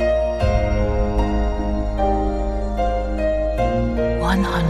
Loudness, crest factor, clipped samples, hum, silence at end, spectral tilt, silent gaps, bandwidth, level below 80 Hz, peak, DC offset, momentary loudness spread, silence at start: -21 LUFS; 12 dB; under 0.1%; none; 0 s; -7.5 dB/octave; none; 10.5 kHz; -24 dBFS; -6 dBFS; under 0.1%; 4 LU; 0 s